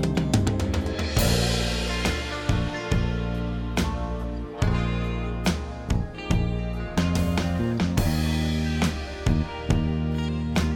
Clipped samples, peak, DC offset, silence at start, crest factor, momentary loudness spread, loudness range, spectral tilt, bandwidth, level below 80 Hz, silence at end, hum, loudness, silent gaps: under 0.1%; -6 dBFS; under 0.1%; 0 s; 18 dB; 5 LU; 3 LU; -5.5 dB/octave; 17.5 kHz; -30 dBFS; 0 s; none; -26 LUFS; none